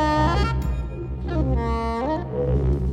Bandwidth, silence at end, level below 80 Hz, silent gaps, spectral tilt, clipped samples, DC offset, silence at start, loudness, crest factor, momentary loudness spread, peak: 9 kHz; 0 s; -26 dBFS; none; -7.5 dB/octave; under 0.1%; under 0.1%; 0 s; -24 LUFS; 12 dB; 8 LU; -10 dBFS